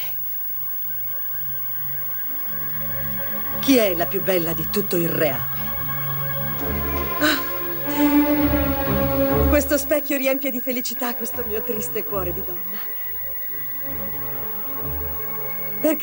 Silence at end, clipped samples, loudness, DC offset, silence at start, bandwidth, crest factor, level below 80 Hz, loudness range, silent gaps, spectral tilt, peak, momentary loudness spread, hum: 0 s; under 0.1%; -21 LUFS; under 0.1%; 0 s; 16.5 kHz; 16 dB; -38 dBFS; 4 LU; none; -5 dB/octave; -6 dBFS; 6 LU; 50 Hz at -55 dBFS